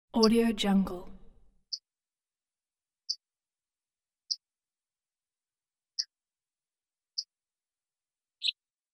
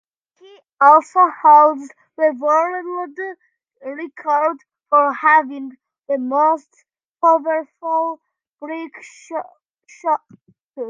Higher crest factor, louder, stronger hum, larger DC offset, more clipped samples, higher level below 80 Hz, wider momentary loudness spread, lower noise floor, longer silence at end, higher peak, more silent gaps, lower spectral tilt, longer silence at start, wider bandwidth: first, 26 dB vs 18 dB; second, -31 LUFS vs -16 LUFS; neither; neither; neither; first, -58 dBFS vs -82 dBFS; second, 15 LU vs 20 LU; first, under -90 dBFS vs -49 dBFS; first, 0.45 s vs 0 s; second, -10 dBFS vs 0 dBFS; second, none vs 7.05-7.15 s, 8.49-8.56 s, 9.70-9.74 s, 10.63-10.67 s; about the same, -4.5 dB/octave vs -4 dB/octave; second, 0.15 s vs 0.8 s; first, 15 kHz vs 7.6 kHz